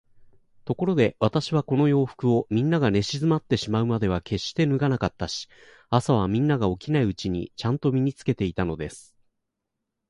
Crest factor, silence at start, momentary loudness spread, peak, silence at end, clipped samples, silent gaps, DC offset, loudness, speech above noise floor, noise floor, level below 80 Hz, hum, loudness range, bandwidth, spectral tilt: 20 dB; 0.65 s; 8 LU; -4 dBFS; 1.1 s; under 0.1%; none; under 0.1%; -24 LUFS; 58 dB; -82 dBFS; -48 dBFS; none; 3 LU; 11.5 kHz; -7 dB/octave